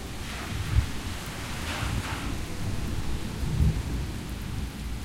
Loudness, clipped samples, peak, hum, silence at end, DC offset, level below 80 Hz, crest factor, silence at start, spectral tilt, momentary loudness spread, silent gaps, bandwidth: -32 LUFS; under 0.1%; -10 dBFS; none; 0 s; under 0.1%; -34 dBFS; 20 dB; 0 s; -5 dB/octave; 8 LU; none; 16.5 kHz